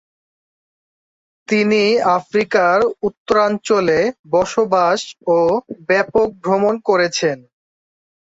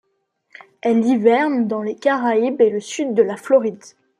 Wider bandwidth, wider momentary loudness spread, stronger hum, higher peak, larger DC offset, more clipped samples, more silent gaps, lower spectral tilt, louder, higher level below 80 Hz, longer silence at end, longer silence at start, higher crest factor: second, 8 kHz vs 11 kHz; about the same, 6 LU vs 7 LU; neither; about the same, -2 dBFS vs -2 dBFS; neither; neither; first, 3.17-3.26 s, 4.19-4.24 s vs none; about the same, -4.5 dB/octave vs -5.5 dB/octave; about the same, -16 LUFS vs -18 LUFS; first, -54 dBFS vs -72 dBFS; first, 1 s vs 0.3 s; first, 1.5 s vs 0.85 s; about the same, 16 dB vs 16 dB